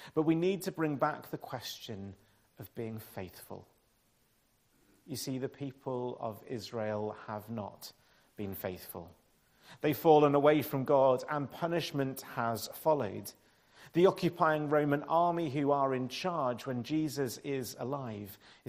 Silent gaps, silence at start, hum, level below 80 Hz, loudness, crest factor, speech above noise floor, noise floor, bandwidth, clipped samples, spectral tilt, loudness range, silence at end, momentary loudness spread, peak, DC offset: none; 0 s; none; -72 dBFS; -33 LUFS; 22 dB; 39 dB; -72 dBFS; 15.5 kHz; under 0.1%; -6 dB/octave; 15 LU; 0.35 s; 18 LU; -12 dBFS; under 0.1%